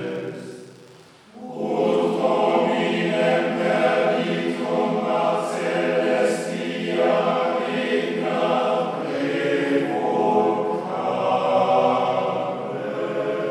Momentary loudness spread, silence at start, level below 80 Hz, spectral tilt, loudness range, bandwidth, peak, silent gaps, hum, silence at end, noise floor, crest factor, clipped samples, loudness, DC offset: 8 LU; 0 s; -76 dBFS; -5.5 dB/octave; 2 LU; 12.5 kHz; -6 dBFS; none; none; 0 s; -48 dBFS; 16 dB; under 0.1%; -22 LUFS; under 0.1%